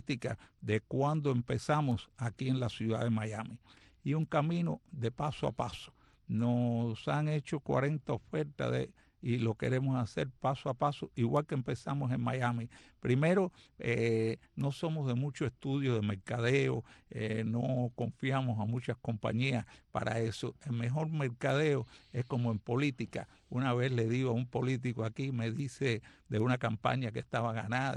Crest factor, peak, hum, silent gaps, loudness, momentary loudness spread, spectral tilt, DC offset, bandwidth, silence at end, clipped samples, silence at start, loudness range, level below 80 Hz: 18 dB; -16 dBFS; none; none; -35 LUFS; 8 LU; -7 dB/octave; under 0.1%; 11 kHz; 0 s; under 0.1%; 0.1 s; 2 LU; -64 dBFS